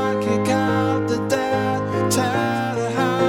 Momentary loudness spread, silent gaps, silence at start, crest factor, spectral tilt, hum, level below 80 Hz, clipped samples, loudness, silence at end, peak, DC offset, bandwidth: 3 LU; none; 0 s; 14 dB; -5.5 dB/octave; none; -54 dBFS; under 0.1%; -21 LUFS; 0 s; -6 dBFS; under 0.1%; 18 kHz